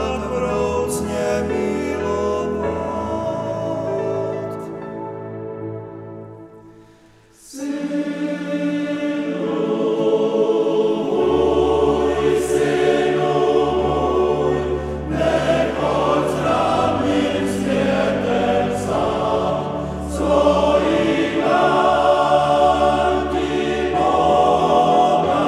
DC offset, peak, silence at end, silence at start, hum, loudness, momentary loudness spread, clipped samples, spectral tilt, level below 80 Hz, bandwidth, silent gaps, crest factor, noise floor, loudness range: under 0.1%; -2 dBFS; 0 s; 0 s; none; -19 LUFS; 10 LU; under 0.1%; -6 dB/octave; -38 dBFS; 14 kHz; none; 16 dB; -50 dBFS; 11 LU